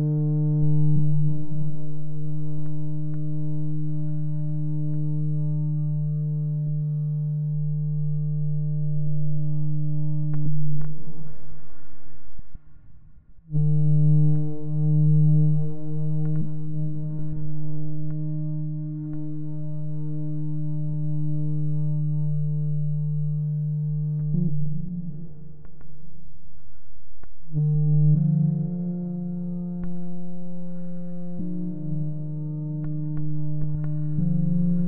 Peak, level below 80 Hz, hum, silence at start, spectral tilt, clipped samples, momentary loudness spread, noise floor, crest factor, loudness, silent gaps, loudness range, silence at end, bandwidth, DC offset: -10 dBFS; -48 dBFS; none; 0 s; -15 dB/octave; under 0.1%; 11 LU; -46 dBFS; 12 dB; -27 LUFS; none; 9 LU; 0 s; 1.5 kHz; under 0.1%